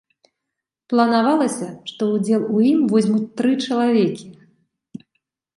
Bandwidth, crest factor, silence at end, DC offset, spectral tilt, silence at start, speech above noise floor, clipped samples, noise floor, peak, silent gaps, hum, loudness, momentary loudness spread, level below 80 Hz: 11.5 kHz; 18 dB; 0.6 s; under 0.1%; -6 dB/octave; 0.9 s; 64 dB; under 0.1%; -82 dBFS; -2 dBFS; none; none; -19 LUFS; 8 LU; -70 dBFS